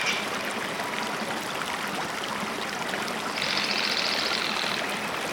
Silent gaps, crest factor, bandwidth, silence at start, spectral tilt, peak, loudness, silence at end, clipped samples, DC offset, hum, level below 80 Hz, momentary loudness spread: none; 18 dB; over 20 kHz; 0 s; -2 dB/octave; -10 dBFS; -27 LUFS; 0 s; under 0.1%; under 0.1%; none; -64 dBFS; 6 LU